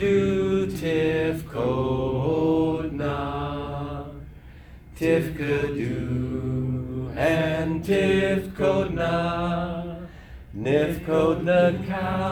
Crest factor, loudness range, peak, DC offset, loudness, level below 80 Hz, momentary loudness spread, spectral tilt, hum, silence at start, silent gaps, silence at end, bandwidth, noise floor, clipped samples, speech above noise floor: 18 dB; 4 LU; -8 dBFS; under 0.1%; -24 LUFS; -42 dBFS; 11 LU; -7.5 dB/octave; none; 0 s; none; 0 s; 19.5 kHz; -44 dBFS; under 0.1%; 22 dB